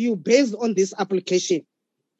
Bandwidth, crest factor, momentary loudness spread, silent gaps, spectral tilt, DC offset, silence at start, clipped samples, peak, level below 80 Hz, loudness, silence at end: 8.4 kHz; 18 dB; 7 LU; none; -4.5 dB/octave; under 0.1%; 0 s; under 0.1%; -4 dBFS; -80 dBFS; -21 LUFS; 0.6 s